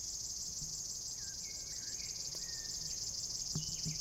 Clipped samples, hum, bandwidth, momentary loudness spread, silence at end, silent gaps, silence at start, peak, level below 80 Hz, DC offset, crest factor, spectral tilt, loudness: under 0.1%; none; 16 kHz; 3 LU; 0 s; none; 0 s; -26 dBFS; -60 dBFS; under 0.1%; 16 dB; -1 dB/octave; -39 LUFS